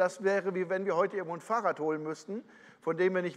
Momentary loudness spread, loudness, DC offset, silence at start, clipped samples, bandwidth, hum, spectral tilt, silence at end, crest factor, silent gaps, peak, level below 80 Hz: 10 LU; -32 LUFS; under 0.1%; 0 s; under 0.1%; 11 kHz; none; -6 dB/octave; 0 s; 16 dB; none; -14 dBFS; -84 dBFS